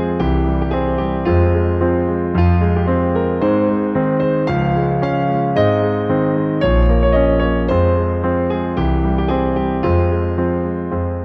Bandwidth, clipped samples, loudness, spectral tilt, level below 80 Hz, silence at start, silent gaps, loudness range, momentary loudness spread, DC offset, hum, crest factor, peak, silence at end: 5.2 kHz; under 0.1%; -17 LUFS; -10.5 dB/octave; -24 dBFS; 0 s; none; 1 LU; 4 LU; under 0.1%; none; 14 dB; -2 dBFS; 0 s